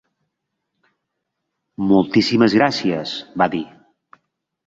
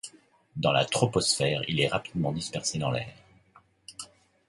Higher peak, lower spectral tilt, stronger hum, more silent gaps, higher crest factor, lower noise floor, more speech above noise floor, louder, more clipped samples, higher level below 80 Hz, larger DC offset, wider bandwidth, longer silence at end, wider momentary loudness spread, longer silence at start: first, -2 dBFS vs -8 dBFS; first, -6 dB/octave vs -4 dB/octave; neither; neither; about the same, 20 dB vs 20 dB; first, -77 dBFS vs -61 dBFS; first, 60 dB vs 33 dB; first, -18 LUFS vs -27 LUFS; neither; about the same, -56 dBFS vs -58 dBFS; neither; second, 7.8 kHz vs 11.5 kHz; first, 1 s vs 0.45 s; second, 12 LU vs 19 LU; first, 1.8 s vs 0.05 s